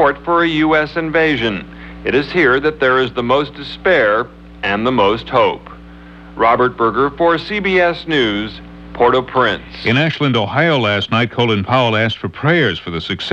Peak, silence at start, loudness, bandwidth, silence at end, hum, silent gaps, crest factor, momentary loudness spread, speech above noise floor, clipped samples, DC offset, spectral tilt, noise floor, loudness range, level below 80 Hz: 0 dBFS; 0 s; -15 LUFS; 8.2 kHz; 0 s; none; none; 14 dB; 9 LU; 21 dB; under 0.1%; under 0.1%; -6.5 dB/octave; -36 dBFS; 1 LU; -40 dBFS